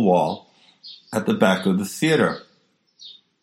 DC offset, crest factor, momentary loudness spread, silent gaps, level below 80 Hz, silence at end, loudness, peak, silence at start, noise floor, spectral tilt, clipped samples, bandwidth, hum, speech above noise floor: under 0.1%; 20 dB; 23 LU; none; -66 dBFS; 0.3 s; -21 LUFS; -2 dBFS; 0 s; -63 dBFS; -5.5 dB/octave; under 0.1%; 16 kHz; none; 43 dB